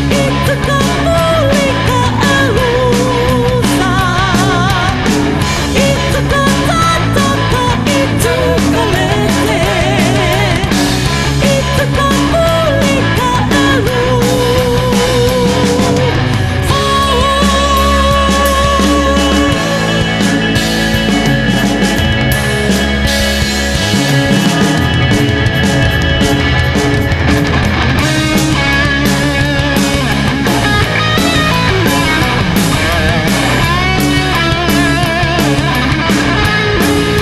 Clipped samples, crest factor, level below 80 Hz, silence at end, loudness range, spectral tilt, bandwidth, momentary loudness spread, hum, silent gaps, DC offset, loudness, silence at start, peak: under 0.1%; 10 dB; -22 dBFS; 0 s; 1 LU; -5 dB/octave; 14 kHz; 2 LU; none; none; under 0.1%; -11 LUFS; 0 s; 0 dBFS